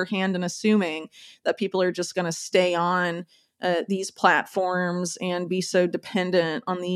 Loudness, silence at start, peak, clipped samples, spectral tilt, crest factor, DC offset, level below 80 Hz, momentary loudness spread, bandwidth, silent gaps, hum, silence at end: -25 LUFS; 0 s; -2 dBFS; under 0.1%; -4.5 dB/octave; 22 dB; under 0.1%; -78 dBFS; 8 LU; 14 kHz; none; none; 0 s